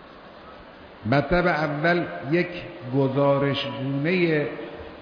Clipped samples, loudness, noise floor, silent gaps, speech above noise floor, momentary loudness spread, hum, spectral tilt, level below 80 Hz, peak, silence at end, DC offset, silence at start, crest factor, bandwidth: under 0.1%; -23 LUFS; -44 dBFS; none; 21 dB; 20 LU; none; -8.5 dB/octave; -46 dBFS; -8 dBFS; 0 s; under 0.1%; 0 s; 16 dB; 5.4 kHz